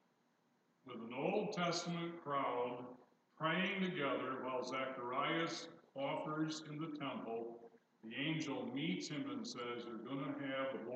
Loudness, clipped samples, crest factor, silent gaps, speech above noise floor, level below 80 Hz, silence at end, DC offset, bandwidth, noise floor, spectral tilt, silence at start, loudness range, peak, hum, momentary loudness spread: -42 LUFS; under 0.1%; 18 dB; none; 36 dB; under -90 dBFS; 0 s; under 0.1%; 8.8 kHz; -78 dBFS; -5 dB/octave; 0.85 s; 4 LU; -26 dBFS; none; 10 LU